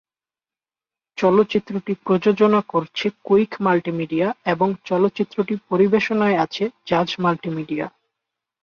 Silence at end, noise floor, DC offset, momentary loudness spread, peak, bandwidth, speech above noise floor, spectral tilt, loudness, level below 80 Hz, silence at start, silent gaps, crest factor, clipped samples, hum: 0.75 s; under -90 dBFS; under 0.1%; 9 LU; -4 dBFS; 7 kHz; over 70 dB; -7 dB/octave; -20 LUFS; -62 dBFS; 1.15 s; none; 16 dB; under 0.1%; none